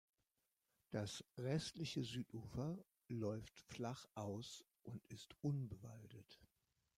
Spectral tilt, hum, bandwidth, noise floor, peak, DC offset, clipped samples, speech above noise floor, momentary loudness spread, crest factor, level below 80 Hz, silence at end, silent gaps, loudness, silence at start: -6 dB/octave; none; 16 kHz; -89 dBFS; -30 dBFS; under 0.1%; under 0.1%; 41 dB; 14 LU; 18 dB; -74 dBFS; 0.5 s; none; -49 LUFS; 0.9 s